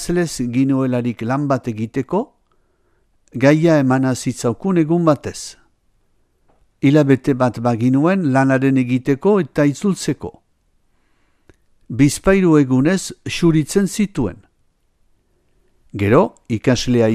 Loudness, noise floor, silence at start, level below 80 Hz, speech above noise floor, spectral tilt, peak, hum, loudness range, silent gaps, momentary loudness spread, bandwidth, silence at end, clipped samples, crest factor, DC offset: -17 LUFS; -61 dBFS; 0 s; -42 dBFS; 45 dB; -6.5 dB/octave; 0 dBFS; none; 4 LU; none; 10 LU; 14.5 kHz; 0 s; under 0.1%; 18 dB; under 0.1%